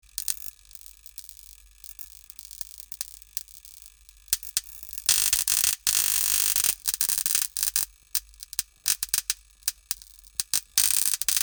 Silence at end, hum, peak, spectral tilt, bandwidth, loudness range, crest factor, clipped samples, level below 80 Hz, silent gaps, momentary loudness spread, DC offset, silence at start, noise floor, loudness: 0 s; none; -2 dBFS; 2.5 dB/octave; over 20 kHz; 16 LU; 26 dB; under 0.1%; -56 dBFS; none; 21 LU; under 0.1%; 0.2 s; -51 dBFS; -24 LUFS